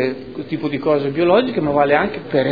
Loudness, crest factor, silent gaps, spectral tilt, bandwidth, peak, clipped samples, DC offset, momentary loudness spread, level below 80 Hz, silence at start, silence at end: -18 LUFS; 16 dB; none; -9 dB/octave; 5 kHz; 0 dBFS; under 0.1%; 0.4%; 9 LU; -50 dBFS; 0 s; 0 s